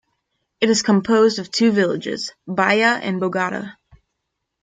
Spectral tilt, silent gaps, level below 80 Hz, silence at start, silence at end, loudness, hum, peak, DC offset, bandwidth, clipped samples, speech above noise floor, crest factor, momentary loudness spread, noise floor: -4.5 dB/octave; none; -62 dBFS; 0.6 s; 0.9 s; -18 LUFS; none; -2 dBFS; under 0.1%; 9.6 kHz; under 0.1%; 59 dB; 18 dB; 11 LU; -78 dBFS